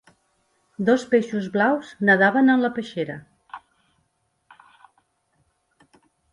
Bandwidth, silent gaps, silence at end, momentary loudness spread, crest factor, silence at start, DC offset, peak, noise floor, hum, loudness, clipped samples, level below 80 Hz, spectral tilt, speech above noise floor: 11 kHz; none; 2.75 s; 26 LU; 20 dB; 0.8 s; under 0.1%; -4 dBFS; -71 dBFS; none; -21 LUFS; under 0.1%; -68 dBFS; -6.5 dB/octave; 51 dB